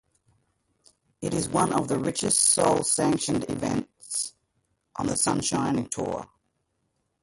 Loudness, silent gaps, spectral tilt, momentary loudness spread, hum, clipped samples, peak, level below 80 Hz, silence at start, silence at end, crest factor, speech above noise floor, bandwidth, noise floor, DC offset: -25 LUFS; none; -3.5 dB/octave; 13 LU; none; under 0.1%; -6 dBFS; -56 dBFS; 1.2 s; 0.95 s; 22 dB; 50 dB; 12 kHz; -75 dBFS; under 0.1%